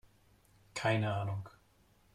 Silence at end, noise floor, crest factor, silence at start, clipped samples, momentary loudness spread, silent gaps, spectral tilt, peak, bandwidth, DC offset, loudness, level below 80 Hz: 0.65 s; -68 dBFS; 20 dB; 0.75 s; under 0.1%; 14 LU; none; -6 dB/octave; -18 dBFS; 12 kHz; under 0.1%; -36 LUFS; -68 dBFS